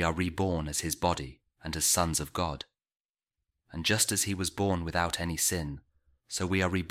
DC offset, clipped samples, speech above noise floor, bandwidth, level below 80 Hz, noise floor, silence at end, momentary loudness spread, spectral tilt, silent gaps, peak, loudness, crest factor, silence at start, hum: under 0.1%; under 0.1%; over 60 dB; 16.5 kHz; -48 dBFS; under -90 dBFS; 0 s; 16 LU; -3.5 dB/octave; 3.00-3.14 s; -12 dBFS; -29 LUFS; 20 dB; 0 s; none